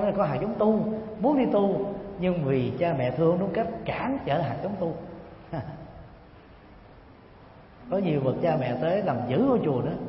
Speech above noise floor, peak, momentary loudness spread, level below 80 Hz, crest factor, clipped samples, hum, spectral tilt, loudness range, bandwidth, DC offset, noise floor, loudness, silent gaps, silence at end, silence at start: 25 dB; -10 dBFS; 13 LU; -54 dBFS; 16 dB; under 0.1%; none; -12 dB/octave; 11 LU; 5.8 kHz; under 0.1%; -50 dBFS; -26 LUFS; none; 0 s; 0 s